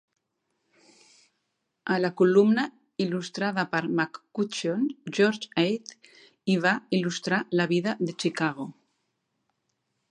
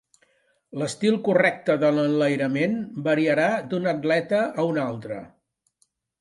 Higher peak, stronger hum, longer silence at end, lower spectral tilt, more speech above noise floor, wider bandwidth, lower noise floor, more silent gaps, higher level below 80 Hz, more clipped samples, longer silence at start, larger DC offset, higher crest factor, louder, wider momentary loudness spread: about the same, -8 dBFS vs -6 dBFS; neither; first, 1.4 s vs 0.95 s; about the same, -5.5 dB/octave vs -6 dB/octave; first, 53 dB vs 47 dB; about the same, 10.5 kHz vs 11.5 kHz; first, -79 dBFS vs -69 dBFS; neither; second, -76 dBFS vs -70 dBFS; neither; first, 1.85 s vs 0.75 s; neither; about the same, 20 dB vs 18 dB; second, -26 LUFS vs -23 LUFS; about the same, 10 LU vs 10 LU